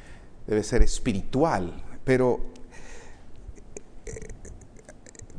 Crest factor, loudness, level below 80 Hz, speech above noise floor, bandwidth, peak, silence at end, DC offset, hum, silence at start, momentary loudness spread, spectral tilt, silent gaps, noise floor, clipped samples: 22 dB; -26 LUFS; -32 dBFS; 25 dB; 10.5 kHz; -4 dBFS; 0 s; under 0.1%; none; 0.05 s; 24 LU; -6 dB/octave; none; -47 dBFS; under 0.1%